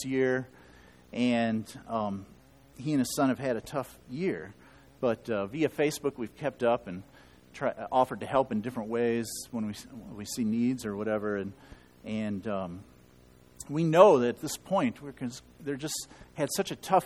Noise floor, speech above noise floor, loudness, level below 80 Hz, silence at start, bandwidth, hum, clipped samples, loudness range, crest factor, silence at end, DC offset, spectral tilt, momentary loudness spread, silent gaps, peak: -58 dBFS; 28 dB; -30 LUFS; -62 dBFS; 0 s; 15 kHz; none; under 0.1%; 6 LU; 26 dB; 0 s; under 0.1%; -5.5 dB/octave; 14 LU; none; -6 dBFS